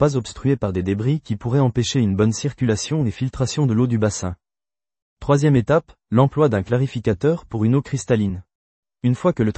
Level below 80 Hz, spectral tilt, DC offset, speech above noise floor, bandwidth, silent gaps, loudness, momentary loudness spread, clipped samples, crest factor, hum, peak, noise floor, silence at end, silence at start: -46 dBFS; -6.5 dB/octave; under 0.1%; over 71 dB; 8.8 kHz; 5.02-5.17 s, 8.55-8.83 s; -20 LUFS; 7 LU; under 0.1%; 18 dB; none; -2 dBFS; under -90 dBFS; 0.05 s; 0 s